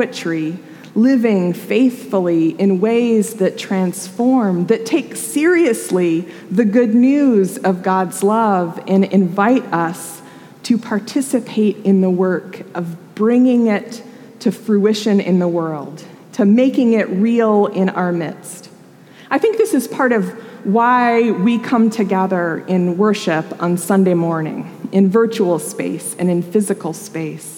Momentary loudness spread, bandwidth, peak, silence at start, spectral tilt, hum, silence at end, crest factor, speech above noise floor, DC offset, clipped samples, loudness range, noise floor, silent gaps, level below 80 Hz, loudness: 12 LU; 17 kHz; -2 dBFS; 0 s; -6.5 dB/octave; none; 0 s; 14 dB; 27 dB; under 0.1%; under 0.1%; 3 LU; -42 dBFS; none; -76 dBFS; -16 LUFS